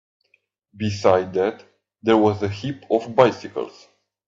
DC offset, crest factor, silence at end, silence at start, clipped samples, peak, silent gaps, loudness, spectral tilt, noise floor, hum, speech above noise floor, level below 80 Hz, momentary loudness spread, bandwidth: under 0.1%; 22 dB; 0.6 s; 0.75 s; under 0.1%; 0 dBFS; none; -21 LUFS; -6.5 dB/octave; -66 dBFS; none; 46 dB; -62 dBFS; 13 LU; 7.6 kHz